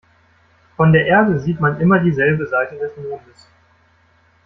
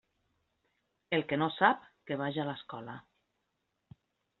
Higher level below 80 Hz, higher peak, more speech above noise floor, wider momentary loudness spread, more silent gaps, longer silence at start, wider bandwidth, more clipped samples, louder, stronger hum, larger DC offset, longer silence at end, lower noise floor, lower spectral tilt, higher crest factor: first, -50 dBFS vs -76 dBFS; first, -2 dBFS vs -10 dBFS; second, 40 dB vs 50 dB; about the same, 16 LU vs 17 LU; neither; second, 0.8 s vs 1.1 s; first, 6 kHz vs 4.3 kHz; neither; first, -16 LUFS vs -32 LUFS; neither; neither; second, 1.25 s vs 1.4 s; second, -55 dBFS vs -82 dBFS; first, -9 dB/octave vs -3.5 dB/octave; second, 16 dB vs 26 dB